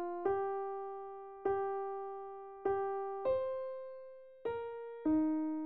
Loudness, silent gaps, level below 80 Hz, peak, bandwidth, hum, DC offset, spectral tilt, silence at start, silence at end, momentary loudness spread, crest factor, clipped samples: -38 LUFS; none; -70 dBFS; -24 dBFS; 4.6 kHz; none; 0.1%; -6 dB/octave; 0 s; 0 s; 13 LU; 14 dB; under 0.1%